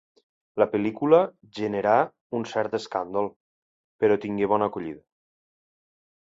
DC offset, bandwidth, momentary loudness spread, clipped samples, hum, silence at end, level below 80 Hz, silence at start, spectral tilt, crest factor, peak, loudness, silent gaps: under 0.1%; 7.8 kHz; 13 LU; under 0.1%; none; 1.3 s; -66 dBFS; 0.55 s; -7 dB/octave; 22 dB; -4 dBFS; -25 LUFS; 2.21-2.30 s, 3.36-3.99 s